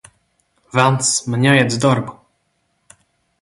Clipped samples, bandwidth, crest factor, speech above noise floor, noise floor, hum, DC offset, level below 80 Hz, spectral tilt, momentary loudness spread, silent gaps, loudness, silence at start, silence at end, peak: under 0.1%; 11.5 kHz; 18 dB; 51 dB; -67 dBFS; none; under 0.1%; -56 dBFS; -4.5 dB/octave; 8 LU; none; -16 LUFS; 0.75 s; 1.3 s; 0 dBFS